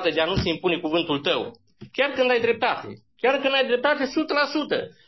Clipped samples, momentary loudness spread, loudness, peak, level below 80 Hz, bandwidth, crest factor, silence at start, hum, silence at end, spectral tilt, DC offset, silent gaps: under 0.1%; 7 LU; -23 LUFS; -8 dBFS; -48 dBFS; 6 kHz; 16 dB; 0 s; none; 0.15 s; -5.5 dB/octave; under 0.1%; none